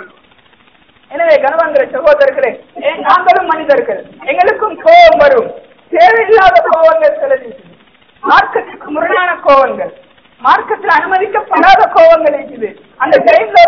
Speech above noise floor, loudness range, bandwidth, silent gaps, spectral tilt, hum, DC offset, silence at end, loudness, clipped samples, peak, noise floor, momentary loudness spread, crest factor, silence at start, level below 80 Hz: 38 dB; 4 LU; 5.4 kHz; none; -4.5 dB/octave; none; under 0.1%; 0 s; -9 LUFS; 5%; 0 dBFS; -47 dBFS; 13 LU; 10 dB; 0 s; -44 dBFS